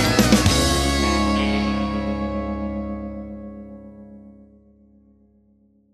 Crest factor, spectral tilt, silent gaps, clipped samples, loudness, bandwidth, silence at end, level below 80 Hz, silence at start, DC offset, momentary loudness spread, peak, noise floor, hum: 22 dB; -4.5 dB/octave; none; under 0.1%; -21 LUFS; 15 kHz; 1.65 s; -32 dBFS; 0 s; under 0.1%; 23 LU; 0 dBFS; -58 dBFS; none